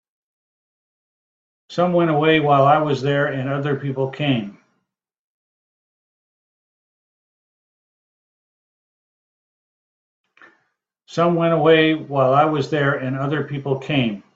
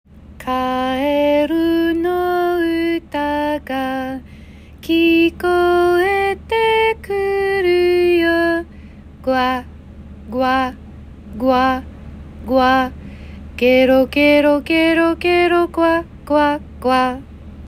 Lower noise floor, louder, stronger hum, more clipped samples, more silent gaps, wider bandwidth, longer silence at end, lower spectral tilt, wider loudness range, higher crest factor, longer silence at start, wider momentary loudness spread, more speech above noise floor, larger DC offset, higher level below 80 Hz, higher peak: first, -72 dBFS vs -38 dBFS; about the same, -18 LUFS vs -16 LUFS; neither; neither; first, 5.18-10.24 s vs none; second, 7.8 kHz vs 15.5 kHz; first, 0.15 s vs 0 s; first, -7.5 dB/octave vs -5.5 dB/octave; first, 10 LU vs 6 LU; first, 20 dB vs 14 dB; first, 1.7 s vs 0.2 s; second, 10 LU vs 14 LU; first, 54 dB vs 24 dB; neither; second, -62 dBFS vs -40 dBFS; about the same, -2 dBFS vs -4 dBFS